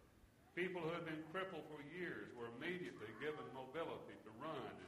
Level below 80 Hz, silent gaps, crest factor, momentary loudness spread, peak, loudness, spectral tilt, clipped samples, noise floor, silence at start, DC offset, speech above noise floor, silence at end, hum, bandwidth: -80 dBFS; none; 20 dB; 7 LU; -30 dBFS; -49 LUFS; -6 dB/octave; under 0.1%; -69 dBFS; 0 s; under 0.1%; 20 dB; 0 s; none; 14.5 kHz